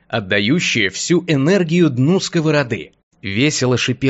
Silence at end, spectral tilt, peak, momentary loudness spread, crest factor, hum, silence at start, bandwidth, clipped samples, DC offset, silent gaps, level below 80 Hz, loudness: 0 s; -5 dB/octave; -2 dBFS; 7 LU; 14 dB; none; 0.1 s; 8.2 kHz; under 0.1%; under 0.1%; 3.03-3.11 s; -54 dBFS; -16 LUFS